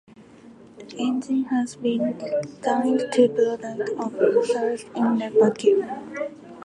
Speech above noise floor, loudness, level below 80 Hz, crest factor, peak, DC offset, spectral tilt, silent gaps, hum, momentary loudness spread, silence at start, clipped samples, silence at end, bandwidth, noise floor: 25 dB; -23 LUFS; -70 dBFS; 18 dB; -4 dBFS; under 0.1%; -5.5 dB/octave; none; none; 11 LU; 0.2 s; under 0.1%; 0.05 s; 11 kHz; -47 dBFS